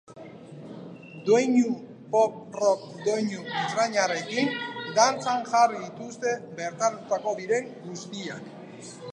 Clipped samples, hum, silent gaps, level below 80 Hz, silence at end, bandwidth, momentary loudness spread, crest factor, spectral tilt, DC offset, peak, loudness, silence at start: under 0.1%; none; none; -78 dBFS; 0 s; 10 kHz; 20 LU; 22 dB; -4 dB/octave; under 0.1%; -4 dBFS; -26 LUFS; 0.1 s